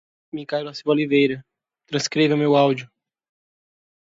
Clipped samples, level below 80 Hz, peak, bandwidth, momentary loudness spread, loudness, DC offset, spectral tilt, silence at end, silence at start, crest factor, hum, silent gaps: under 0.1%; -68 dBFS; -4 dBFS; 7.8 kHz; 14 LU; -21 LUFS; under 0.1%; -5.5 dB/octave; 1.2 s; 0.35 s; 18 dB; none; none